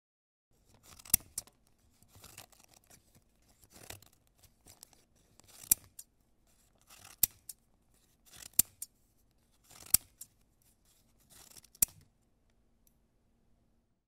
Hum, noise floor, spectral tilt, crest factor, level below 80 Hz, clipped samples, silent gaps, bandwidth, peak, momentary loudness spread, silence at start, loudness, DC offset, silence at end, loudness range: none; -73 dBFS; 0 dB/octave; 36 dB; -64 dBFS; under 0.1%; none; 16 kHz; -6 dBFS; 25 LU; 1.15 s; -31 LUFS; under 0.1%; 4.1 s; 21 LU